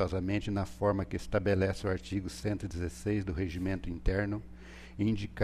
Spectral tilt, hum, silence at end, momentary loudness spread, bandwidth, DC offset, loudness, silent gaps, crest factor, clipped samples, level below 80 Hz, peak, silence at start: -7 dB/octave; none; 0 s; 7 LU; 13.5 kHz; under 0.1%; -34 LUFS; none; 16 dB; under 0.1%; -44 dBFS; -16 dBFS; 0 s